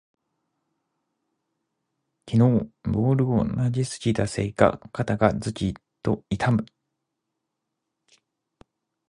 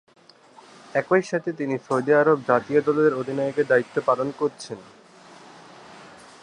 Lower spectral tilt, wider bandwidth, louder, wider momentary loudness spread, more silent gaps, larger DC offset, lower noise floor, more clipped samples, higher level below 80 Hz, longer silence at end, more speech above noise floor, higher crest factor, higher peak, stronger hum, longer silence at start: about the same, -7 dB/octave vs -6.5 dB/octave; about the same, 11 kHz vs 10 kHz; about the same, -24 LUFS vs -22 LUFS; about the same, 8 LU vs 9 LU; neither; neither; first, -82 dBFS vs -51 dBFS; neither; first, -48 dBFS vs -70 dBFS; first, 2.45 s vs 0.4 s; first, 59 dB vs 29 dB; about the same, 24 dB vs 20 dB; about the same, -2 dBFS vs -4 dBFS; neither; first, 2.25 s vs 0.95 s